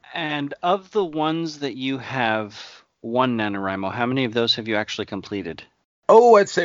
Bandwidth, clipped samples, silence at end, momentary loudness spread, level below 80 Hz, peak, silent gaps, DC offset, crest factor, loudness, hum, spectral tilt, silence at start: 7.6 kHz; under 0.1%; 0 s; 16 LU; -64 dBFS; 0 dBFS; 5.85-6.03 s; under 0.1%; 20 dB; -21 LUFS; none; -5 dB/octave; 0.1 s